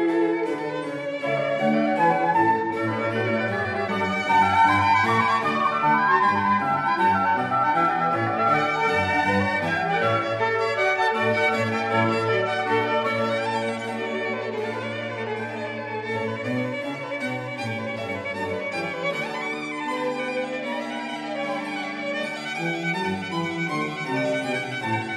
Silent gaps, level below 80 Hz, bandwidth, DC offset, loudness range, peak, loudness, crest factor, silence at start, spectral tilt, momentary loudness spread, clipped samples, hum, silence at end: none; -66 dBFS; 13.5 kHz; under 0.1%; 8 LU; -8 dBFS; -23 LUFS; 16 dB; 0 s; -5.5 dB/octave; 9 LU; under 0.1%; none; 0 s